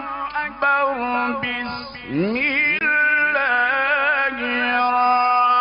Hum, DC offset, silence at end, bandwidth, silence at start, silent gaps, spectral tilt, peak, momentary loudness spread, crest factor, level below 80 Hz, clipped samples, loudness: none; under 0.1%; 0 s; 5.6 kHz; 0 s; none; -8 dB/octave; -8 dBFS; 9 LU; 12 dB; -54 dBFS; under 0.1%; -19 LUFS